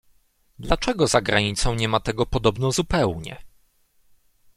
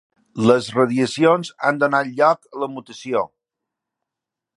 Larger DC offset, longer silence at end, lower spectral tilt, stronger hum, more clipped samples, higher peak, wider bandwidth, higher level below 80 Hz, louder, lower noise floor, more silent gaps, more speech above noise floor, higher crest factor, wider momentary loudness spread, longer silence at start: neither; second, 1.1 s vs 1.3 s; about the same, -4.5 dB/octave vs -5.5 dB/octave; neither; neither; about the same, -2 dBFS vs 0 dBFS; first, 15 kHz vs 11.5 kHz; first, -36 dBFS vs -66 dBFS; second, -22 LUFS vs -19 LUFS; second, -61 dBFS vs -85 dBFS; neither; second, 39 dB vs 67 dB; about the same, 22 dB vs 20 dB; second, 8 LU vs 12 LU; first, 0.6 s vs 0.35 s